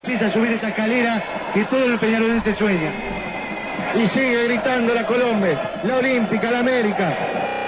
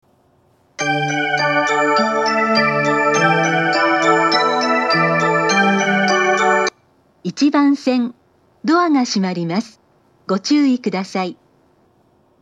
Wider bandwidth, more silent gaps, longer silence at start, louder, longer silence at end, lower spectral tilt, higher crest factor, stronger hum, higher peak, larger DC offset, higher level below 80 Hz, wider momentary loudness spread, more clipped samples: second, 4 kHz vs 10 kHz; neither; second, 0.05 s vs 0.8 s; second, -20 LUFS vs -16 LUFS; second, 0 s vs 1.1 s; first, -9.5 dB/octave vs -4.5 dB/octave; about the same, 12 dB vs 16 dB; neither; second, -8 dBFS vs 0 dBFS; neither; first, -48 dBFS vs -72 dBFS; second, 6 LU vs 9 LU; neither